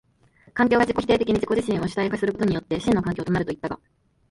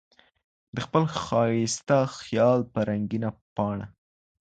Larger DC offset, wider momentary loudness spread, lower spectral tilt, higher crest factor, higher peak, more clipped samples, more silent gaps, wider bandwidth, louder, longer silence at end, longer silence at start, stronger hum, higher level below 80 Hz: neither; about the same, 10 LU vs 12 LU; about the same, -6.5 dB/octave vs -6 dB/octave; about the same, 18 dB vs 20 dB; about the same, -6 dBFS vs -8 dBFS; neither; second, none vs 3.41-3.56 s; first, 11.5 kHz vs 9.2 kHz; first, -23 LUFS vs -26 LUFS; about the same, 0.55 s vs 0.6 s; second, 0.55 s vs 0.75 s; neither; first, -48 dBFS vs -58 dBFS